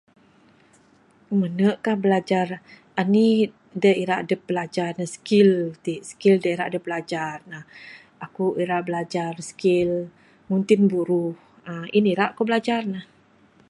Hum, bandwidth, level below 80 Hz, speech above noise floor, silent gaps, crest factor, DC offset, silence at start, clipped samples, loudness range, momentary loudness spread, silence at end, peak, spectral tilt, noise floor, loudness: none; 11.5 kHz; -66 dBFS; 35 dB; none; 18 dB; under 0.1%; 1.3 s; under 0.1%; 5 LU; 17 LU; 0.65 s; -4 dBFS; -6.5 dB/octave; -57 dBFS; -23 LUFS